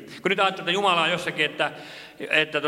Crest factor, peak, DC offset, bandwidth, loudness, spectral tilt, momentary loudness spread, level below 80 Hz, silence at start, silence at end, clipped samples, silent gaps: 20 dB; -6 dBFS; under 0.1%; 16 kHz; -23 LUFS; -3.5 dB/octave; 15 LU; -70 dBFS; 0 s; 0 s; under 0.1%; none